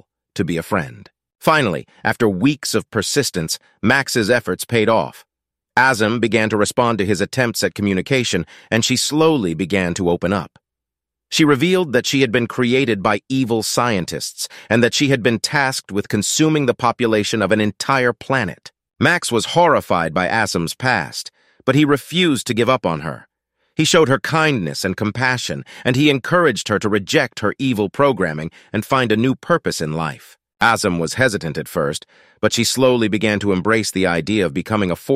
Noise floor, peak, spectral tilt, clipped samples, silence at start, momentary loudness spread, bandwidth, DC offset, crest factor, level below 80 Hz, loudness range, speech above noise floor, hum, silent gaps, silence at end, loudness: -85 dBFS; 0 dBFS; -4.5 dB/octave; under 0.1%; 0.35 s; 8 LU; 15.5 kHz; under 0.1%; 18 dB; -52 dBFS; 2 LU; 67 dB; none; none; 0 s; -18 LUFS